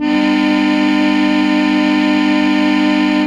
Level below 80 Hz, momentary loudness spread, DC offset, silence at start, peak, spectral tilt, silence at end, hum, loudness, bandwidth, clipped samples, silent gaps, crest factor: -48 dBFS; 0 LU; under 0.1%; 0 s; -2 dBFS; -5.5 dB/octave; 0 s; none; -13 LUFS; 9.6 kHz; under 0.1%; none; 10 dB